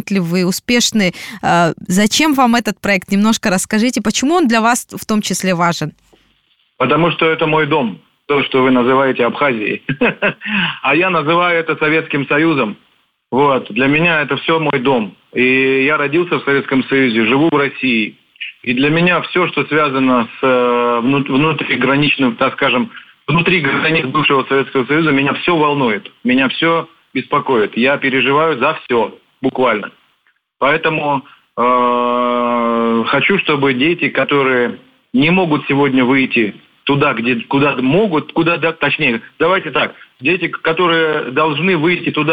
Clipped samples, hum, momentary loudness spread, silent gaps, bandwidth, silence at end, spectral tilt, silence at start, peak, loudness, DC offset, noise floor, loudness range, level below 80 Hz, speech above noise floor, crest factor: under 0.1%; none; 6 LU; none; 16.5 kHz; 0 s; -4.5 dB/octave; 0.05 s; 0 dBFS; -14 LUFS; under 0.1%; -60 dBFS; 2 LU; -52 dBFS; 46 dB; 14 dB